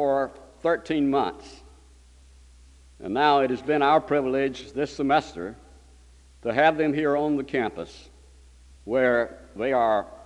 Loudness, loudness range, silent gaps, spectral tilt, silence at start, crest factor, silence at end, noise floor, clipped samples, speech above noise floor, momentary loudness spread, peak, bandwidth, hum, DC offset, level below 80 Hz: -24 LUFS; 3 LU; none; -6 dB/octave; 0 s; 18 dB; 0 s; -52 dBFS; under 0.1%; 28 dB; 15 LU; -6 dBFS; 11 kHz; none; under 0.1%; -52 dBFS